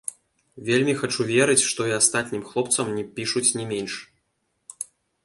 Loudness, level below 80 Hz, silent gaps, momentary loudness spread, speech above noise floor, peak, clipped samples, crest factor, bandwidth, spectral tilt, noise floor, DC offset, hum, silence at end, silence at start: -22 LUFS; -66 dBFS; none; 17 LU; 50 dB; -2 dBFS; under 0.1%; 24 dB; 11.5 kHz; -3 dB/octave; -74 dBFS; under 0.1%; none; 0.4 s; 0.55 s